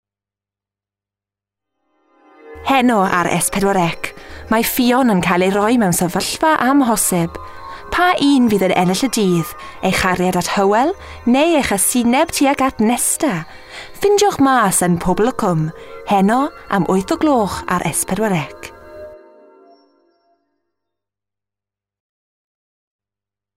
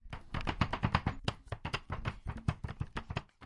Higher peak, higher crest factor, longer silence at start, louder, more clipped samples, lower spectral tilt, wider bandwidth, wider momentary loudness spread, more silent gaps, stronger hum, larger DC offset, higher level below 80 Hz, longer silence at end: first, -2 dBFS vs -12 dBFS; second, 16 dB vs 24 dB; first, 2.45 s vs 0.05 s; first, -15 LUFS vs -38 LUFS; neither; second, -4.5 dB/octave vs -6 dB/octave; first, 16 kHz vs 11.5 kHz; first, 13 LU vs 9 LU; neither; first, 50 Hz at -50 dBFS vs none; neither; about the same, -44 dBFS vs -46 dBFS; first, 4.4 s vs 0 s